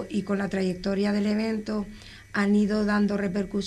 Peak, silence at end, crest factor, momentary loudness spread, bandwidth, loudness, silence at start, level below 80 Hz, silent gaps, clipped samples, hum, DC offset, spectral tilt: -14 dBFS; 0 s; 12 dB; 9 LU; 10.5 kHz; -26 LUFS; 0 s; -50 dBFS; none; under 0.1%; none; under 0.1%; -7 dB/octave